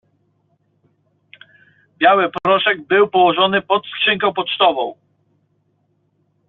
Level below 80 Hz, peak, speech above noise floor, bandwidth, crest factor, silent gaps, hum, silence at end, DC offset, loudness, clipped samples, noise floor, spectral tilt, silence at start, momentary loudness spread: -64 dBFS; -2 dBFS; 48 dB; 4.3 kHz; 16 dB; none; none; 1.55 s; under 0.1%; -16 LUFS; under 0.1%; -64 dBFS; -1 dB/octave; 2 s; 5 LU